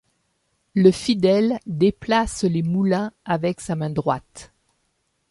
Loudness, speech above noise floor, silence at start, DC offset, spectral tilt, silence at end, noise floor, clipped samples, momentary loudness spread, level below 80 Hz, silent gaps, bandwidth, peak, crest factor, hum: -21 LUFS; 50 dB; 0.75 s; under 0.1%; -6.5 dB/octave; 0.85 s; -70 dBFS; under 0.1%; 8 LU; -48 dBFS; none; 11.5 kHz; -2 dBFS; 18 dB; none